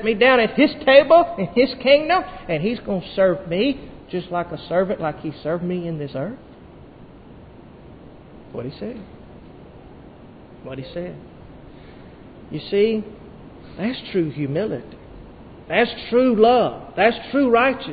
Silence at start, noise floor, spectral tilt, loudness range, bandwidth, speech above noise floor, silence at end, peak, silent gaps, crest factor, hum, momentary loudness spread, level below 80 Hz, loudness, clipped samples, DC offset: 0 s; -43 dBFS; -10.5 dB/octave; 20 LU; 5 kHz; 24 dB; 0 s; 0 dBFS; none; 20 dB; none; 19 LU; -50 dBFS; -19 LUFS; under 0.1%; under 0.1%